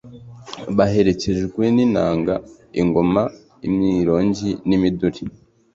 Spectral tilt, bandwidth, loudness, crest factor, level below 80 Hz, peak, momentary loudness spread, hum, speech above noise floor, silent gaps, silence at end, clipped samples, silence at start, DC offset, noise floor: -7.5 dB/octave; 7.8 kHz; -19 LUFS; 16 dB; -44 dBFS; -2 dBFS; 12 LU; none; 21 dB; none; 0.45 s; under 0.1%; 0.05 s; under 0.1%; -39 dBFS